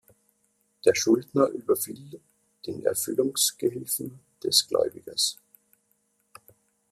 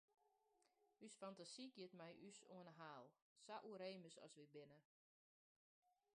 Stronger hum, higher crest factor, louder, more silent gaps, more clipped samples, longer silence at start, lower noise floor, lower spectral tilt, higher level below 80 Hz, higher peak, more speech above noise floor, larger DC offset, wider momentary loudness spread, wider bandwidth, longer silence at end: neither; about the same, 22 dB vs 20 dB; first, -25 LUFS vs -60 LUFS; second, none vs 3.22-3.36 s, 4.85-5.82 s; neither; first, 0.85 s vs 0.2 s; second, -71 dBFS vs -85 dBFS; second, -2.5 dB/octave vs -4 dB/octave; first, -70 dBFS vs under -90 dBFS; first, -6 dBFS vs -42 dBFS; first, 45 dB vs 24 dB; neither; first, 17 LU vs 9 LU; first, 15.5 kHz vs 10 kHz; first, 1.6 s vs 0.25 s